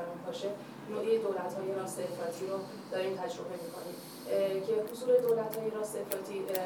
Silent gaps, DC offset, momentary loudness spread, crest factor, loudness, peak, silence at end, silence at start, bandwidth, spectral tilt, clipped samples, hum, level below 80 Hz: none; under 0.1%; 12 LU; 22 dB; -35 LUFS; -12 dBFS; 0 s; 0 s; 19.5 kHz; -4.5 dB/octave; under 0.1%; none; -86 dBFS